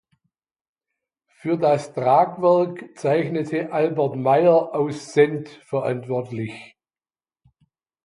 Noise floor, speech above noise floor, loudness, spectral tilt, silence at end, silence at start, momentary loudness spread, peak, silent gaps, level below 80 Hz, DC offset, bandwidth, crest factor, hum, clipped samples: under -90 dBFS; over 70 dB; -21 LUFS; -7 dB/octave; 1.4 s; 1.45 s; 12 LU; -2 dBFS; none; -70 dBFS; under 0.1%; 11 kHz; 20 dB; none; under 0.1%